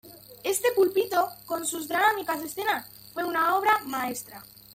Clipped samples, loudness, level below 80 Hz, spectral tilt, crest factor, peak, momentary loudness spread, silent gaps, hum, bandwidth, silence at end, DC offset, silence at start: under 0.1%; -26 LUFS; -68 dBFS; -2 dB/octave; 18 dB; -10 dBFS; 11 LU; none; none; 16.5 kHz; 0.3 s; under 0.1%; 0.05 s